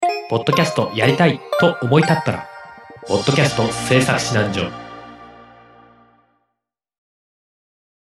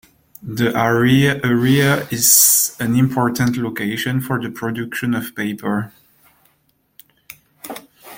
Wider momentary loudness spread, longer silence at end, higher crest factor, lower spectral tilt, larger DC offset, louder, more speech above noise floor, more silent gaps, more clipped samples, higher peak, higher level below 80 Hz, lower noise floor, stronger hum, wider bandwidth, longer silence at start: about the same, 21 LU vs 21 LU; first, 2.65 s vs 0 s; about the same, 20 dB vs 18 dB; about the same, -5 dB/octave vs -4 dB/octave; neither; about the same, -17 LUFS vs -16 LUFS; first, 62 dB vs 46 dB; neither; neither; about the same, 0 dBFS vs 0 dBFS; about the same, -52 dBFS vs -52 dBFS; first, -79 dBFS vs -63 dBFS; neither; second, 14 kHz vs 17 kHz; second, 0 s vs 0.45 s